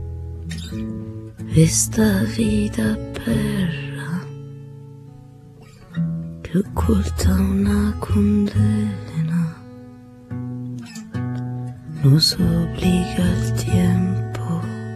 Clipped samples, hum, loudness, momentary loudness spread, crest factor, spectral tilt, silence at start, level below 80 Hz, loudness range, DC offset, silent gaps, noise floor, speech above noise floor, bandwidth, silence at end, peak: under 0.1%; none; -20 LUFS; 17 LU; 18 dB; -5.5 dB/octave; 0 s; -34 dBFS; 8 LU; under 0.1%; none; -43 dBFS; 25 dB; 14 kHz; 0 s; -2 dBFS